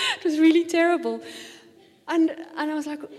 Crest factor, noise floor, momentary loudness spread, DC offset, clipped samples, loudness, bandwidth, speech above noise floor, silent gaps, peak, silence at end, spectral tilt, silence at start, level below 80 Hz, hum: 14 dB; -53 dBFS; 19 LU; under 0.1%; under 0.1%; -23 LUFS; 12.5 kHz; 30 dB; none; -10 dBFS; 0 s; -2.5 dB/octave; 0 s; -78 dBFS; none